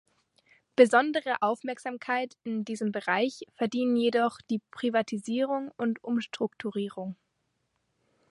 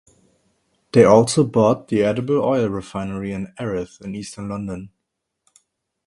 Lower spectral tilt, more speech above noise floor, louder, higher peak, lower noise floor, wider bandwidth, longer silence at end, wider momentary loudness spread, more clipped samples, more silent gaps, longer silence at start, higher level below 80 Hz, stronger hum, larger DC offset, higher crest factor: about the same, -5 dB/octave vs -6 dB/octave; second, 49 dB vs 60 dB; second, -29 LUFS vs -19 LUFS; second, -6 dBFS vs 0 dBFS; about the same, -77 dBFS vs -78 dBFS; about the same, 11.5 kHz vs 11.5 kHz; about the same, 1.15 s vs 1.2 s; second, 11 LU vs 18 LU; neither; neither; second, 0.8 s vs 0.95 s; second, -78 dBFS vs -52 dBFS; neither; neither; about the same, 22 dB vs 20 dB